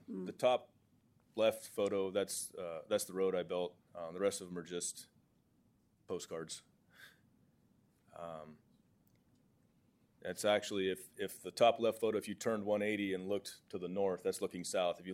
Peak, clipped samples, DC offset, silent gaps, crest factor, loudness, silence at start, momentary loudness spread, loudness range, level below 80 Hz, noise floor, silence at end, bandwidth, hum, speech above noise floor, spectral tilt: -18 dBFS; under 0.1%; under 0.1%; none; 22 dB; -38 LUFS; 0.1 s; 14 LU; 16 LU; -84 dBFS; -73 dBFS; 0 s; 16.5 kHz; none; 36 dB; -3.5 dB/octave